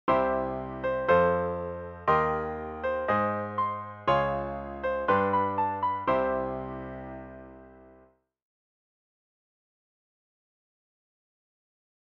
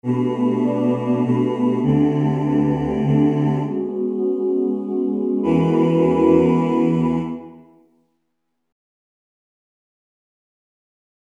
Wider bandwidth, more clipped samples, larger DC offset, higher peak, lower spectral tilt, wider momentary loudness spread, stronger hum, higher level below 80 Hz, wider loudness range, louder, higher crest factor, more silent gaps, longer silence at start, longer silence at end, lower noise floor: second, 6.6 kHz vs 7.8 kHz; neither; neither; second, -10 dBFS vs -4 dBFS; second, -8 dB/octave vs -9.5 dB/octave; first, 13 LU vs 7 LU; neither; about the same, -52 dBFS vs -48 dBFS; first, 12 LU vs 6 LU; second, -28 LUFS vs -19 LUFS; about the same, 20 dB vs 16 dB; neither; about the same, 0.05 s vs 0.05 s; first, 4.2 s vs 3.65 s; second, -61 dBFS vs -76 dBFS